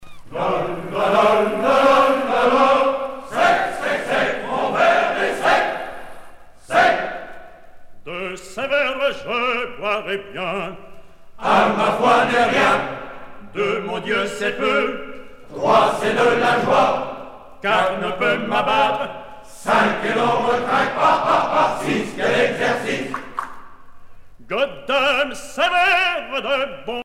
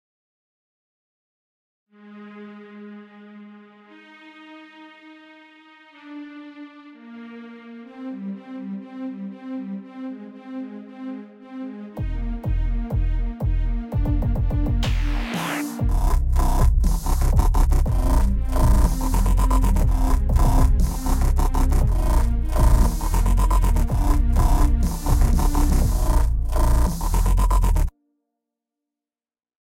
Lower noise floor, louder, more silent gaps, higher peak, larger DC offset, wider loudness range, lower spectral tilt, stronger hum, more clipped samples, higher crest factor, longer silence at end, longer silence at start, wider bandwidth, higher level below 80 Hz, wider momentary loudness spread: second, -39 dBFS vs under -90 dBFS; first, -19 LUFS vs -23 LUFS; neither; about the same, -2 dBFS vs -4 dBFS; neither; second, 6 LU vs 21 LU; second, -4 dB/octave vs -6.5 dB/octave; neither; neither; about the same, 16 dB vs 16 dB; second, 0 s vs 1.9 s; second, 0 s vs 2.05 s; about the same, 15.5 kHz vs 16 kHz; second, -50 dBFS vs -22 dBFS; second, 14 LU vs 20 LU